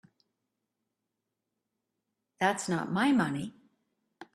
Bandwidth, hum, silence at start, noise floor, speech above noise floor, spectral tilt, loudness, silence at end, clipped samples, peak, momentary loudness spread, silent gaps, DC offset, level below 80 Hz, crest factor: 13 kHz; none; 2.4 s; -86 dBFS; 57 dB; -5 dB/octave; -30 LUFS; 0.1 s; under 0.1%; -14 dBFS; 10 LU; none; under 0.1%; -74 dBFS; 20 dB